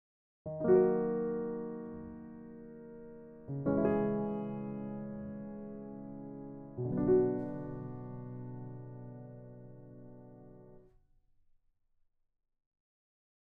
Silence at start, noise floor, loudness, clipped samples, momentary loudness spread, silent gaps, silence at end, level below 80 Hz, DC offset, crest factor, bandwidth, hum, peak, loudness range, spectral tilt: 0.45 s; -74 dBFS; -35 LUFS; under 0.1%; 23 LU; none; 2.6 s; -62 dBFS; under 0.1%; 22 dB; 3.1 kHz; none; -16 dBFS; 18 LU; -11 dB/octave